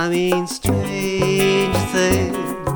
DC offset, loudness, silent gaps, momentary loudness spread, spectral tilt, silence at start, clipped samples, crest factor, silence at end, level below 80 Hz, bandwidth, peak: under 0.1%; -19 LUFS; none; 5 LU; -5 dB/octave; 0 s; under 0.1%; 16 dB; 0 s; -38 dBFS; over 20 kHz; -4 dBFS